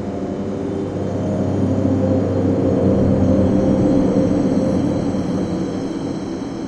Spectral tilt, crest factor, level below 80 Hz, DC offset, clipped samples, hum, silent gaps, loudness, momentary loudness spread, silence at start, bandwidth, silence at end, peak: -8.5 dB/octave; 14 dB; -40 dBFS; under 0.1%; under 0.1%; none; none; -18 LUFS; 8 LU; 0 s; 9 kHz; 0 s; -4 dBFS